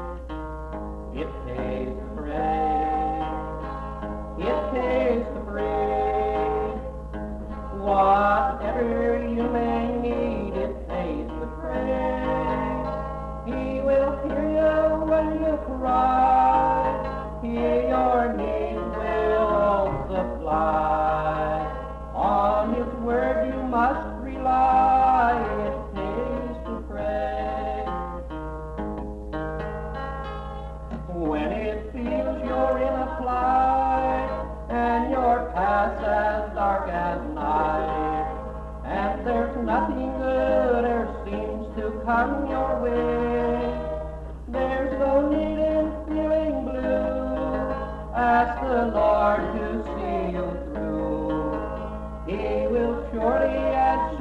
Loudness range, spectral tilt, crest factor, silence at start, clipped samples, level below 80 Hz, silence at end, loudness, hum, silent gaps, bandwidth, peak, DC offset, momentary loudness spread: 6 LU; -8 dB/octave; 14 dB; 0 s; under 0.1%; -36 dBFS; 0 s; -25 LUFS; none; none; 9 kHz; -10 dBFS; under 0.1%; 12 LU